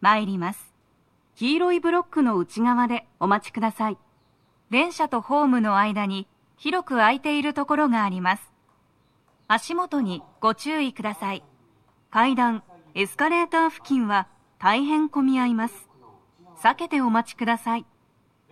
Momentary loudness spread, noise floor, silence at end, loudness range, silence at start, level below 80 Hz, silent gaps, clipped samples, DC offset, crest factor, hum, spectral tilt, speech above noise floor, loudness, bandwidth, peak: 9 LU; -64 dBFS; 0.7 s; 3 LU; 0 s; -72 dBFS; none; under 0.1%; under 0.1%; 20 dB; none; -5 dB/octave; 41 dB; -23 LUFS; 14 kHz; -4 dBFS